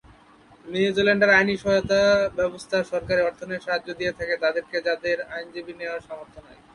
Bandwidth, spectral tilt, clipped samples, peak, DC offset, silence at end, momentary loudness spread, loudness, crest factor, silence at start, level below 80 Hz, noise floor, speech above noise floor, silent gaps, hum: 11.5 kHz; -5 dB/octave; under 0.1%; -6 dBFS; under 0.1%; 0.2 s; 15 LU; -23 LUFS; 20 dB; 0.65 s; -52 dBFS; -53 dBFS; 29 dB; none; none